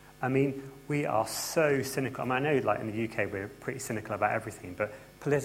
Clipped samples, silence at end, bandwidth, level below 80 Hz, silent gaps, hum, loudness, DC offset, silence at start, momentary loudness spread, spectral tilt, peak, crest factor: under 0.1%; 0 s; 16.5 kHz; -62 dBFS; none; none; -31 LUFS; under 0.1%; 0 s; 9 LU; -5 dB/octave; -12 dBFS; 18 dB